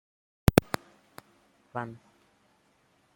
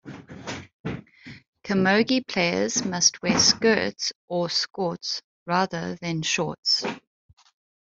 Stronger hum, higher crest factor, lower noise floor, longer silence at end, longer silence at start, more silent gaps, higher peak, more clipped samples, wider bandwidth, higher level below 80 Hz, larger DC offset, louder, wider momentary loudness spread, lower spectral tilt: neither; first, 32 dB vs 20 dB; first, -68 dBFS vs -45 dBFS; first, 1.2 s vs 0.9 s; first, 0.5 s vs 0.05 s; second, none vs 0.73-0.84 s, 1.48-1.53 s, 4.15-4.28 s, 5.24-5.46 s, 6.58-6.63 s; first, 0 dBFS vs -6 dBFS; neither; first, 16.5 kHz vs 8 kHz; first, -46 dBFS vs -62 dBFS; neither; second, -29 LUFS vs -23 LUFS; about the same, 16 LU vs 17 LU; first, -6 dB/octave vs -3 dB/octave